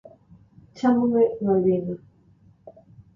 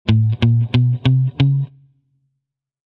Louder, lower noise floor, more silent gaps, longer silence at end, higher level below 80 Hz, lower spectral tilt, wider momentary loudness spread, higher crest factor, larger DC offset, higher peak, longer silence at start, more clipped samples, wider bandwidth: second, -22 LUFS vs -16 LUFS; second, -56 dBFS vs -77 dBFS; neither; second, 0.15 s vs 1.25 s; second, -60 dBFS vs -42 dBFS; about the same, -9 dB/octave vs -9 dB/octave; first, 11 LU vs 4 LU; about the same, 16 dB vs 12 dB; neither; second, -10 dBFS vs -4 dBFS; first, 0.75 s vs 0.05 s; neither; first, 7.4 kHz vs 5.6 kHz